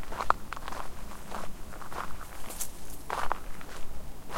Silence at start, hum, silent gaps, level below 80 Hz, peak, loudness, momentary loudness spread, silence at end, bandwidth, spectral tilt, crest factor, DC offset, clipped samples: 0 s; none; none; -44 dBFS; -2 dBFS; -38 LUFS; 14 LU; 0 s; 17 kHz; -3 dB/octave; 28 dB; 2%; under 0.1%